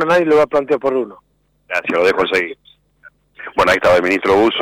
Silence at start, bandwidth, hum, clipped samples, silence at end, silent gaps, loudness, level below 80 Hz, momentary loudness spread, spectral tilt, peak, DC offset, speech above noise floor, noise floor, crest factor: 0 s; 16 kHz; none; under 0.1%; 0 s; none; -15 LUFS; -48 dBFS; 11 LU; -4.5 dB/octave; -6 dBFS; under 0.1%; 34 dB; -48 dBFS; 10 dB